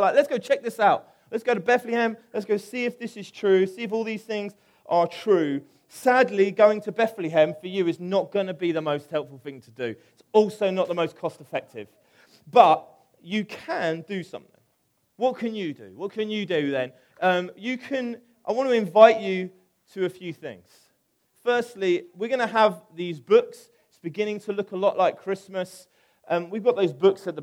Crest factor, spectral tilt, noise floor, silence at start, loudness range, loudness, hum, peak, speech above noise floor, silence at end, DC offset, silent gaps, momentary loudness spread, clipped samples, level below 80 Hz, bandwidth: 24 dB; -5.5 dB/octave; -70 dBFS; 0 s; 6 LU; -24 LUFS; none; 0 dBFS; 46 dB; 0 s; under 0.1%; none; 14 LU; under 0.1%; -78 dBFS; 16 kHz